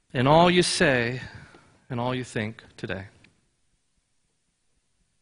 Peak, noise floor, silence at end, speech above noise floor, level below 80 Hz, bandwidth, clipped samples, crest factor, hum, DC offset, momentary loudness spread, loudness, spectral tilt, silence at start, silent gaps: -4 dBFS; -72 dBFS; 2.15 s; 48 dB; -54 dBFS; 11 kHz; under 0.1%; 22 dB; none; under 0.1%; 18 LU; -23 LUFS; -5 dB/octave; 0.15 s; none